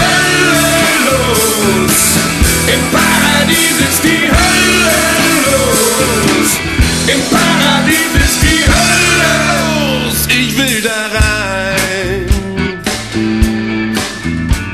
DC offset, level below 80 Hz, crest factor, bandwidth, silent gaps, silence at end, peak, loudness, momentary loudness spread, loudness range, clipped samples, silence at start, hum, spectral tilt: 0.4%; -22 dBFS; 10 dB; 14.5 kHz; none; 0 s; 0 dBFS; -10 LUFS; 7 LU; 5 LU; under 0.1%; 0 s; none; -3 dB/octave